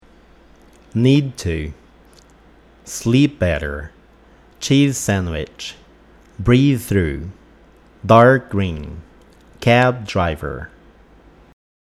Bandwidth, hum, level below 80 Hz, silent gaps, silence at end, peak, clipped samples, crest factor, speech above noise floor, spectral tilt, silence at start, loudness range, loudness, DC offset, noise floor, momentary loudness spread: 14.5 kHz; none; -38 dBFS; none; 1.25 s; 0 dBFS; under 0.1%; 20 dB; 32 dB; -6 dB/octave; 0.95 s; 5 LU; -17 LUFS; under 0.1%; -48 dBFS; 18 LU